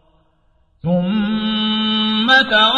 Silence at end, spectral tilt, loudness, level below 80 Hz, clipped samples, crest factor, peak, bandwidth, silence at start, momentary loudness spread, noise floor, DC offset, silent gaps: 0 s; -5.5 dB/octave; -15 LUFS; -50 dBFS; under 0.1%; 16 dB; -2 dBFS; 8 kHz; 0.85 s; 8 LU; -58 dBFS; under 0.1%; none